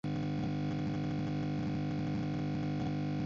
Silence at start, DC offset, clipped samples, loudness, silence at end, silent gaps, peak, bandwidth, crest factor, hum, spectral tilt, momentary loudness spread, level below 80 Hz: 0.05 s; under 0.1%; under 0.1%; -36 LUFS; 0 s; none; -26 dBFS; 7.4 kHz; 8 dB; none; -7.5 dB/octave; 0 LU; -54 dBFS